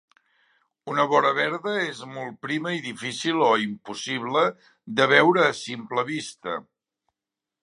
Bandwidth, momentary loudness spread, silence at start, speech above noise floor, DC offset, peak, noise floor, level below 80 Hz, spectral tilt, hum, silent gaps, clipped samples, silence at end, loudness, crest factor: 11.5 kHz; 15 LU; 0.85 s; 64 dB; under 0.1%; -2 dBFS; -88 dBFS; -74 dBFS; -4 dB/octave; none; none; under 0.1%; 1 s; -24 LUFS; 24 dB